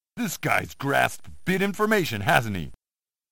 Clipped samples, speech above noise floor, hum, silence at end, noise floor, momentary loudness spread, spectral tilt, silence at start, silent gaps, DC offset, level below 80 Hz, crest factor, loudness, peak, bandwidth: under 0.1%; over 65 dB; none; 0 s; under -90 dBFS; 10 LU; -4.5 dB/octave; 0 s; none; under 0.1%; -54 dBFS; 22 dB; -25 LUFS; -4 dBFS; 17 kHz